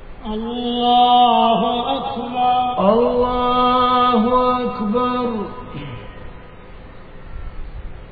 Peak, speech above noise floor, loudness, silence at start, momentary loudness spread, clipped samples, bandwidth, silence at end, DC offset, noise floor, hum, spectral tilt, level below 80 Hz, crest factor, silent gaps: -2 dBFS; 21 dB; -17 LUFS; 0 s; 23 LU; under 0.1%; 4.9 kHz; 0 s; 0.5%; -38 dBFS; none; -8.5 dB/octave; -36 dBFS; 16 dB; none